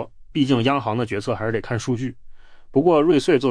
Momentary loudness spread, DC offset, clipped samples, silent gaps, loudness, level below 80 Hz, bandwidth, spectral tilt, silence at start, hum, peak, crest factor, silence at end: 9 LU; under 0.1%; under 0.1%; none; -21 LUFS; -48 dBFS; 10.5 kHz; -6.5 dB/octave; 0 s; none; -6 dBFS; 16 dB; 0 s